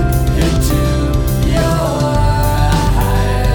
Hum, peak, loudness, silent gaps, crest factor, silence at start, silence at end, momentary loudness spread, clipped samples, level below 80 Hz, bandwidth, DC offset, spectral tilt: none; 0 dBFS; -14 LUFS; none; 12 dB; 0 s; 0 s; 1 LU; under 0.1%; -16 dBFS; over 20 kHz; under 0.1%; -6 dB/octave